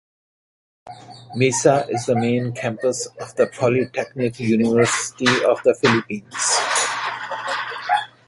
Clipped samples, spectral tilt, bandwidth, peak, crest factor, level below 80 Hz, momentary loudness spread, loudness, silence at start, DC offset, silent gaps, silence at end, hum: under 0.1%; -4 dB/octave; 11.5 kHz; -2 dBFS; 18 dB; -60 dBFS; 9 LU; -20 LUFS; 0.85 s; under 0.1%; none; 0.2 s; none